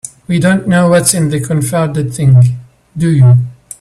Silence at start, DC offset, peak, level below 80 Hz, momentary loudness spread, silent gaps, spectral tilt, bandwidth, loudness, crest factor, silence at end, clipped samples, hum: 0.05 s; under 0.1%; 0 dBFS; -42 dBFS; 9 LU; none; -6 dB/octave; 14 kHz; -11 LUFS; 10 dB; 0.3 s; under 0.1%; none